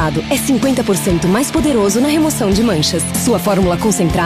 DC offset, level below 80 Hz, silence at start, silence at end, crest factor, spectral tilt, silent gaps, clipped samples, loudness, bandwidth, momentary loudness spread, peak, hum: under 0.1%; -32 dBFS; 0 s; 0 s; 10 dB; -4.5 dB/octave; none; under 0.1%; -14 LUFS; 15.5 kHz; 2 LU; -4 dBFS; none